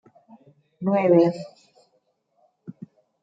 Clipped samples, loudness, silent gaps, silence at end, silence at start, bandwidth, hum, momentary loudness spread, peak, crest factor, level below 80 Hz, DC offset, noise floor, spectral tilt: under 0.1%; -20 LUFS; none; 0.5 s; 0.8 s; 7.8 kHz; none; 25 LU; -6 dBFS; 20 dB; -76 dBFS; under 0.1%; -69 dBFS; -9 dB/octave